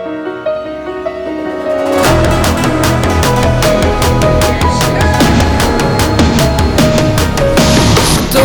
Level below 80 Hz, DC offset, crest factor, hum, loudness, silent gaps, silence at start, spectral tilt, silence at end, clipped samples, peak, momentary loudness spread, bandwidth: -20 dBFS; under 0.1%; 10 dB; none; -11 LUFS; none; 0 s; -5 dB/octave; 0 s; under 0.1%; 0 dBFS; 10 LU; over 20 kHz